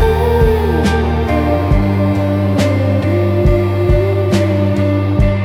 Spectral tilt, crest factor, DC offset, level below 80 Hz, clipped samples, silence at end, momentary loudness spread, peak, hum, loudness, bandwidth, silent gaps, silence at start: -8 dB/octave; 10 dB; under 0.1%; -22 dBFS; under 0.1%; 0 s; 2 LU; -2 dBFS; none; -14 LUFS; 15.5 kHz; none; 0 s